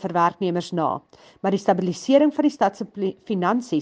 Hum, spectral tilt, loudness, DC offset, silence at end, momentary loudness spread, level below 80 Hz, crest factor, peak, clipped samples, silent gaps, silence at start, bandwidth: none; -6.5 dB/octave; -22 LUFS; under 0.1%; 0 s; 10 LU; -68 dBFS; 18 dB; -4 dBFS; under 0.1%; none; 0 s; 9.2 kHz